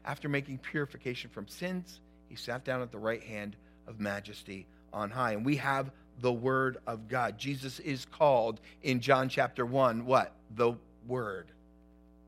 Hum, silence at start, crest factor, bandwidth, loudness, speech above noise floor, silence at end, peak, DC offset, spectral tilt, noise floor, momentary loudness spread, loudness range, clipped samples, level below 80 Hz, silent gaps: none; 0.05 s; 24 dB; 16 kHz; -33 LUFS; 26 dB; 0.8 s; -10 dBFS; under 0.1%; -6 dB/octave; -59 dBFS; 16 LU; 9 LU; under 0.1%; -62 dBFS; none